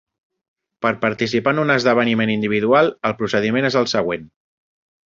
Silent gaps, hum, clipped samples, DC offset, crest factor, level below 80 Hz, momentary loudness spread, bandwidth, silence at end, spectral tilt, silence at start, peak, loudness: none; none; under 0.1%; under 0.1%; 18 dB; -56 dBFS; 7 LU; 7.6 kHz; 0.8 s; -5.5 dB/octave; 0.8 s; -2 dBFS; -18 LUFS